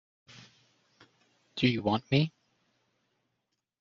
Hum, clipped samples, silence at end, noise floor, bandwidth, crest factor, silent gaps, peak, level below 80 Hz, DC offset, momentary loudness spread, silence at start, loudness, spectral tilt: none; under 0.1%; 1.5 s; -83 dBFS; 7.4 kHz; 22 dB; none; -12 dBFS; -68 dBFS; under 0.1%; 7 LU; 1.55 s; -29 LUFS; -5 dB/octave